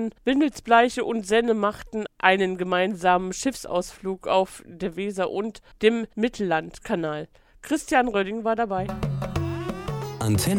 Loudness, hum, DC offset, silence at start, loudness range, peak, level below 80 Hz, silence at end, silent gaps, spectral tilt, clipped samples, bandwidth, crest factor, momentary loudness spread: -25 LUFS; none; under 0.1%; 0 s; 4 LU; -2 dBFS; -48 dBFS; 0 s; none; -5 dB/octave; under 0.1%; 18 kHz; 22 dB; 11 LU